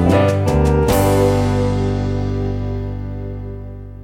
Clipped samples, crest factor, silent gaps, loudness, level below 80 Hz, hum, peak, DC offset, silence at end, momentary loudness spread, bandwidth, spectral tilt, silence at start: under 0.1%; 16 dB; none; -17 LUFS; -26 dBFS; 50 Hz at -30 dBFS; -2 dBFS; under 0.1%; 0 s; 14 LU; 16.5 kHz; -7 dB/octave; 0 s